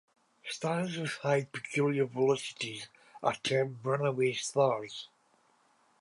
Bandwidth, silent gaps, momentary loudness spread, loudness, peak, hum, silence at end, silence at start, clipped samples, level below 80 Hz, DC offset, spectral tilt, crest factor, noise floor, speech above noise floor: 11.5 kHz; none; 14 LU; -32 LUFS; -12 dBFS; none; 0.95 s; 0.45 s; under 0.1%; -78 dBFS; under 0.1%; -5 dB/octave; 20 dB; -69 dBFS; 38 dB